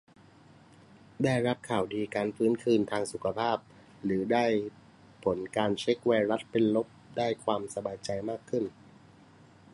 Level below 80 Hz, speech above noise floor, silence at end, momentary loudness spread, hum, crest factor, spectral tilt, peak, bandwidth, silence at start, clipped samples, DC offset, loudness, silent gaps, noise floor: -66 dBFS; 27 dB; 1.05 s; 8 LU; none; 20 dB; -6 dB/octave; -12 dBFS; 11.5 kHz; 1.2 s; under 0.1%; under 0.1%; -30 LUFS; none; -57 dBFS